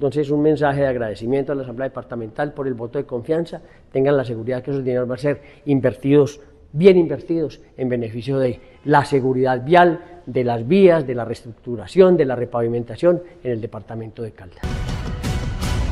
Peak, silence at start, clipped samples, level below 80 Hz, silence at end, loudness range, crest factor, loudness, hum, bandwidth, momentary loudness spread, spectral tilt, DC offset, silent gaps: 0 dBFS; 0 s; under 0.1%; -38 dBFS; 0 s; 6 LU; 18 dB; -20 LUFS; none; 12.5 kHz; 16 LU; -7.5 dB/octave; under 0.1%; none